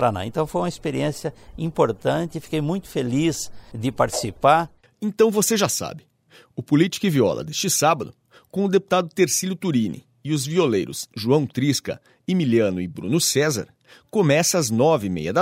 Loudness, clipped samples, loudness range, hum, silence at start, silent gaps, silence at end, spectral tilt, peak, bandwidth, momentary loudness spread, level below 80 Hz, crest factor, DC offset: -22 LUFS; under 0.1%; 3 LU; none; 0 s; none; 0 s; -4.5 dB/octave; -4 dBFS; 16 kHz; 12 LU; -54 dBFS; 18 dB; under 0.1%